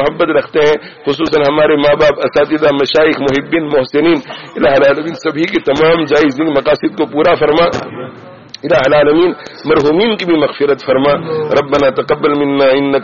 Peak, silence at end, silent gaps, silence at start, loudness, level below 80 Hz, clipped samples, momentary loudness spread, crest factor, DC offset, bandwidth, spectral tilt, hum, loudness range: 0 dBFS; 0 s; none; 0 s; -11 LUFS; -42 dBFS; under 0.1%; 6 LU; 10 dB; 0.4%; 7.2 kHz; -3.5 dB/octave; none; 1 LU